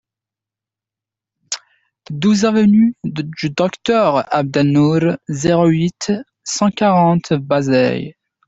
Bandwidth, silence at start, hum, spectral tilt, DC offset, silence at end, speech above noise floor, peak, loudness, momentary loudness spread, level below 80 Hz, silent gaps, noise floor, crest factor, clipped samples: 8 kHz; 1.5 s; none; -6 dB/octave; under 0.1%; 0.35 s; 72 dB; -2 dBFS; -16 LUFS; 12 LU; -54 dBFS; none; -87 dBFS; 14 dB; under 0.1%